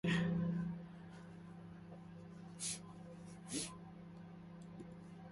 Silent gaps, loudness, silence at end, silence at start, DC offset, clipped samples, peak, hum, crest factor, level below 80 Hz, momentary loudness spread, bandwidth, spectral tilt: none; -46 LUFS; 0 s; 0.05 s; under 0.1%; under 0.1%; -26 dBFS; 50 Hz at -60 dBFS; 20 dB; -68 dBFS; 16 LU; 11.5 kHz; -5 dB/octave